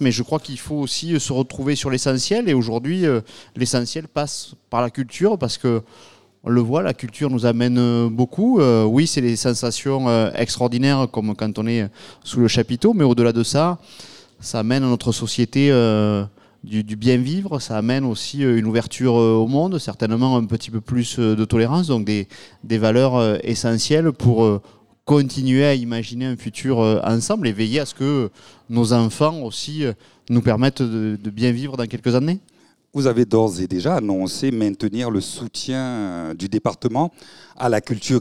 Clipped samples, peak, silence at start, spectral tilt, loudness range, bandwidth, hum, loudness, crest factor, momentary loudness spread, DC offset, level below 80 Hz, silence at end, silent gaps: under 0.1%; -2 dBFS; 0 s; -6 dB/octave; 4 LU; 13 kHz; none; -20 LUFS; 16 dB; 9 LU; 0.4%; -52 dBFS; 0 s; none